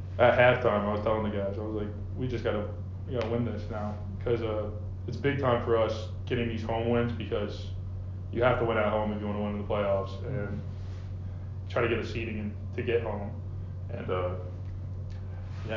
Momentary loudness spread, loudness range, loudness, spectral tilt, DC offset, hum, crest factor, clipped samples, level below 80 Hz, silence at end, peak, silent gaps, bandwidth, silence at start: 12 LU; 3 LU; -31 LUFS; -8 dB/octave; under 0.1%; none; 22 dB; under 0.1%; -42 dBFS; 0 s; -8 dBFS; none; 7.2 kHz; 0 s